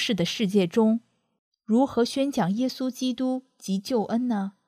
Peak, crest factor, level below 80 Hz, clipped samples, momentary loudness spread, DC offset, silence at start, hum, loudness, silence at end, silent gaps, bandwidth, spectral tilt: -10 dBFS; 16 dB; -66 dBFS; under 0.1%; 7 LU; under 0.1%; 0 s; none; -25 LUFS; 0.15 s; 1.39-1.52 s; 15 kHz; -5.5 dB/octave